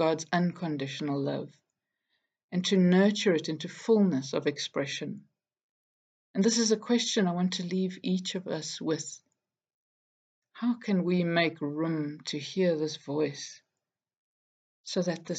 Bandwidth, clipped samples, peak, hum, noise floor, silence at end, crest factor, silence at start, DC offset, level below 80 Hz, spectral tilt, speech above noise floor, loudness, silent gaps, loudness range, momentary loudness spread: 9 kHz; under 0.1%; -12 dBFS; none; -89 dBFS; 0 s; 18 dB; 0 s; under 0.1%; -82 dBFS; -5 dB/octave; 60 dB; -29 LUFS; 2.44-2.49 s, 5.63-6.34 s, 9.74-10.42 s, 14.17-14.84 s; 6 LU; 11 LU